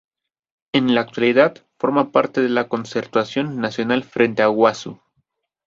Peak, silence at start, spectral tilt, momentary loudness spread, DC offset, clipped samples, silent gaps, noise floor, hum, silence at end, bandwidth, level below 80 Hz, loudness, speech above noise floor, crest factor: -2 dBFS; 0.75 s; -6 dB/octave; 8 LU; under 0.1%; under 0.1%; none; -70 dBFS; none; 0.7 s; 7.6 kHz; -62 dBFS; -19 LUFS; 52 dB; 18 dB